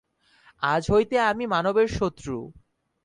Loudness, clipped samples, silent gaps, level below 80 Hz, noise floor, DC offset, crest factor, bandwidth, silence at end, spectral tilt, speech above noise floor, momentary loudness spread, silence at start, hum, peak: -24 LUFS; under 0.1%; none; -48 dBFS; -59 dBFS; under 0.1%; 16 dB; 10.5 kHz; 0.55 s; -5.5 dB/octave; 35 dB; 13 LU; 0.6 s; none; -10 dBFS